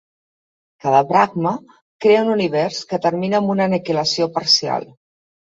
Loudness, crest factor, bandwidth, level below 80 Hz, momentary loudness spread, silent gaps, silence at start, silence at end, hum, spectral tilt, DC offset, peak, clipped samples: -18 LUFS; 16 dB; 7.8 kHz; -64 dBFS; 8 LU; 1.82-1.99 s; 0.85 s; 0.6 s; none; -4.5 dB/octave; under 0.1%; -2 dBFS; under 0.1%